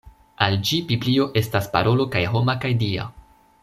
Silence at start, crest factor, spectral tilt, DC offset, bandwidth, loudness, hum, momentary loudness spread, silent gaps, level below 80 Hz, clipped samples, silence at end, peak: 0.05 s; 20 dB; -6 dB/octave; under 0.1%; 14.5 kHz; -21 LUFS; none; 4 LU; none; -50 dBFS; under 0.1%; 0.4 s; -2 dBFS